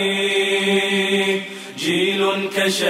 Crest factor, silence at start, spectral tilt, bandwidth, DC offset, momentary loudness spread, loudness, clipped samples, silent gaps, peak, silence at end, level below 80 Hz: 12 dB; 0 s; -3.5 dB/octave; 16 kHz; under 0.1%; 6 LU; -18 LUFS; under 0.1%; none; -6 dBFS; 0 s; -70 dBFS